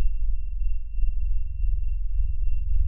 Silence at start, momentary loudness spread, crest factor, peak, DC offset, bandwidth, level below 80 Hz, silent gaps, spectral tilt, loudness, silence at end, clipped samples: 0 s; 3 LU; 10 dB; -10 dBFS; 4%; 2.9 kHz; -24 dBFS; none; -10 dB/octave; -32 LUFS; 0 s; under 0.1%